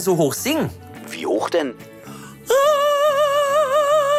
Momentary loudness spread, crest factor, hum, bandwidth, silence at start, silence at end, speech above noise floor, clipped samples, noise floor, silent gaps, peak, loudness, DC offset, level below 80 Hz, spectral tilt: 21 LU; 10 dB; none; 16 kHz; 0 s; 0 s; 17 dB; under 0.1%; -38 dBFS; none; -8 dBFS; -19 LUFS; under 0.1%; -60 dBFS; -4 dB/octave